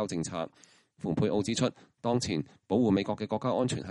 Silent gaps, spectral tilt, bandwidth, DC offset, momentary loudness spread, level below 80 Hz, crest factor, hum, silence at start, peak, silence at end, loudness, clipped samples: none; -5.5 dB/octave; 11.5 kHz; under 0.1%; 9 LU; -60 dBFS; 16 dB; none; 0 s; -14 dBFS; 0 s; -31 LUFS; under 0.1%